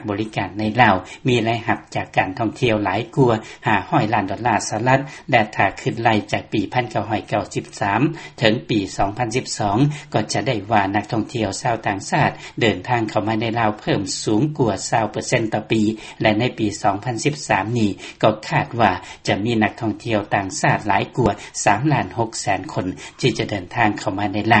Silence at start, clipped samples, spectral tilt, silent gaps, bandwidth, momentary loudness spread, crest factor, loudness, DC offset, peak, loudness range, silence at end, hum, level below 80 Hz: 0 s; under 0.1%; -5 dB/octave; none; 8.8 kHz; 5 LU; 20 dB; -20 LUFS; under 0.1%; 0 dBFS; 2 LU; 0 s; none; -48 dBFS